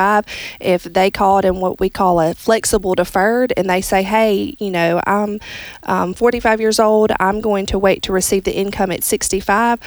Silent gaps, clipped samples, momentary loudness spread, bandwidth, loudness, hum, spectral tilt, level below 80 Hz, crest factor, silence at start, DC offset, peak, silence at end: none; under 0.1%; 6 LU; over 20 kHz; -16 LUFS; none; -4 dB/octave; -38 dBFS; 14 dB; 0 s; under 0.1%; -2 dBFS; 0 s